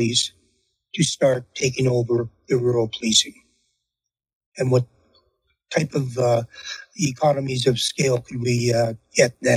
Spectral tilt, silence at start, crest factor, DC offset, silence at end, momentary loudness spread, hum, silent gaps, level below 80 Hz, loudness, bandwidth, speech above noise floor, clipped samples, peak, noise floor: -4.5 dB/octave; 0 s; 20 dB; under 0.1%; 0 s; 8 LU; none; 4.35-4.52 s; -58 dBFS; -21 LUFS; 15.5 kHz; 64 dB; under 0.1%; -2 dBFS; -85 dBFS